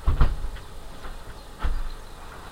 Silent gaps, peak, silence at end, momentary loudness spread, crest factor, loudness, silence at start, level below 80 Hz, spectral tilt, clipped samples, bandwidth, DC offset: none; -6 dBFS; 0 s; 16 LU; 20 dB; -34 LUFS; 0 s; -28 dBFS; -6 dB/octave; under 0.1%; 10.5 kHz; 0.2%